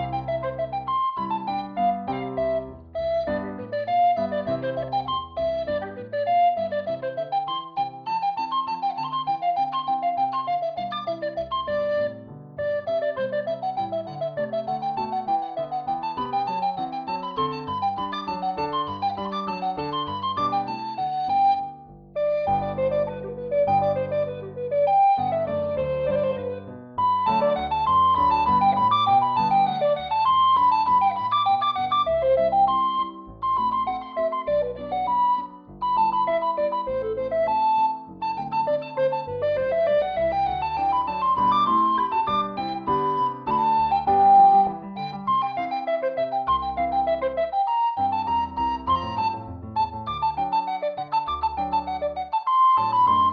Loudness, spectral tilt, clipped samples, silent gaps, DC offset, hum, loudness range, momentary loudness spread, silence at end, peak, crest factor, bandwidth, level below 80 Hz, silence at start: -24 LUFS; -3.5 dB/octave; under 0.1%; none; under 0.1%; none; 7 LU; 10 LU; 0 s; -8 dBFS; 16 dB; 6.4 kHz; -52 dBFS; 0 s